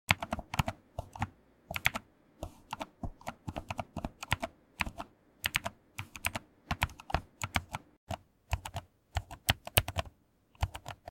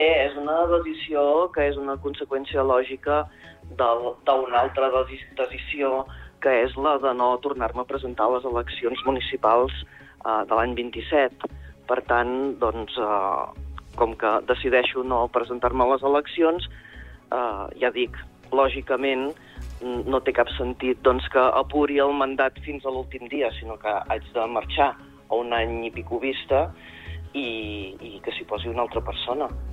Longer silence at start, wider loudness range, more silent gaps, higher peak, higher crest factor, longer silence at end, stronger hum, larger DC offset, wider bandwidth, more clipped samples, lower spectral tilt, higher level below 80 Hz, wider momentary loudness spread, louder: about the same, 0.1 s vs 0 s; about the same, 4 LU vs 4 LU; first, 7.97-8.07 s vs none; about the same, -4 dBFS vs -6 dBFS; first, 34 dB vs 18 dB; about the same, 0 s vs 0 s; neither; neither; first, 17 kHz vs 8.6 kHz; neither; second, -3.5 dB/octave vs -7 dB/octave; second, -48 dBFS vs -42 dBFS; first, 15 LU vs 12 LU; second, -37 LUFS vs -24 LUFS